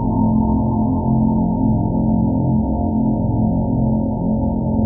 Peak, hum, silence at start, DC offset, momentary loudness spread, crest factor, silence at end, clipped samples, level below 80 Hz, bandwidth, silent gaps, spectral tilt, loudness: -4 dBFS; none; 0 s; under 0.1%; 3 LU; 12 dB; 0 s; under 0.1%; -28 dBFS; 1.1 kHz; none; -7 dB/octave; -18 LUFS